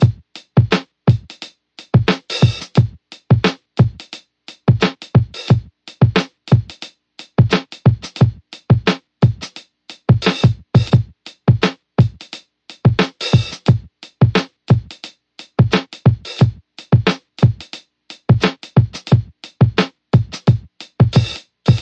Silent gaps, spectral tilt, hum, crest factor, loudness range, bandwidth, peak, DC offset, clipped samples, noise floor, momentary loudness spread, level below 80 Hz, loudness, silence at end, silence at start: none; -7 dB/octave; none; 16 dB; 1 LU; 8 kHz; 0 dBFS; under 0.1%; under 0.1%; -43 dBFS; 17 LU; -40 dBFS; -17 LUFS; 0 s; 0 s